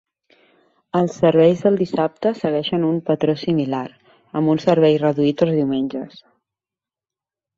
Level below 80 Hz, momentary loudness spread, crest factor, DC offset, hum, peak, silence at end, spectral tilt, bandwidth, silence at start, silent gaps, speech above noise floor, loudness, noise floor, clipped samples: -60 dBFS; 11 LU; 18 dB; under 0.1%; none; -2 dBFS; 1.5 s; -8 dB/octave; 7.6 kHz; 0.95 s; none; 72 dB; -19 LUFS; -90 dBFS; under 0.1%